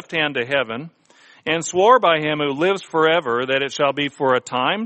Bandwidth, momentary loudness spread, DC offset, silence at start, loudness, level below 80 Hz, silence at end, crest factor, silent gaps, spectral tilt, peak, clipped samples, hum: 8.8 kHz; 8 LU; under 0.1%; 0.1 s; -19 LUFS; -64 dBFS; 0 s; 18 dB; none; -4 dB/octave; -2 dBFS; under 0.1%; none